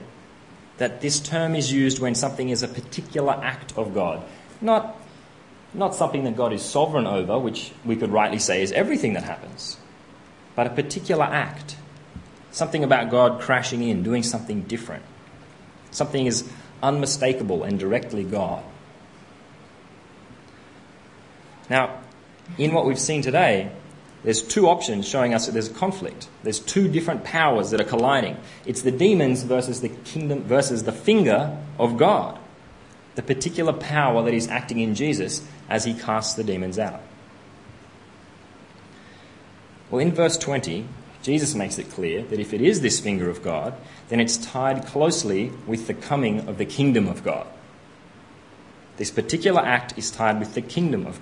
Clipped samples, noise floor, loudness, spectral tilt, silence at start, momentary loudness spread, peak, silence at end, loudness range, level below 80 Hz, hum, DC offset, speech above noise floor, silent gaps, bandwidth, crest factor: under 0.1%; -48 dBFS; -23 LUFS; -4.5 dB/octave; 0 s; 14 LU; -2 dBFS; 0 s; 6 LU; -60 dBFS; none; under 0.1%; 25 dB; none; 11 kHz; 22 dB